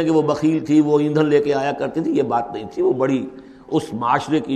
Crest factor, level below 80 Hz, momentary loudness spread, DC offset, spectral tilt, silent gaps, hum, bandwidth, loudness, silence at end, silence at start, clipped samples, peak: 16 dB; -56 dBFS; 7 LU; under 0.1%; -7 dB/octave; none; none; 10 kHz; -19 LUFS; 0 s; 0 s; under 0.1%; -4 dBFS